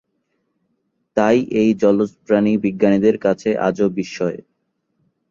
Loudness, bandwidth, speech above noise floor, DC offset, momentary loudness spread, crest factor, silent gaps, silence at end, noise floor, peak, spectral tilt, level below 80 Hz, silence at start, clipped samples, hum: -18 LUFS; 7.4 kHz; 54 dB; under 0.1%; 9 LU; 16 dB; none; 0.95 s; -71 dBFS; -2 dBFS; -7 dB/octave; -56 dBFS; 1.15 s; under 0.1%; none